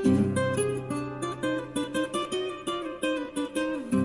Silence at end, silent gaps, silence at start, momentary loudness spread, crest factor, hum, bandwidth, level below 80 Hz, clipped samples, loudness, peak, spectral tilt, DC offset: 0 s; none; 0 s; 6 LU; 16 dB; none; 11.5 kHz; -60 dBFS; under 0.1%; -30 LUFS; -12 dBFS; -5.5 dB/octave; under 0.1%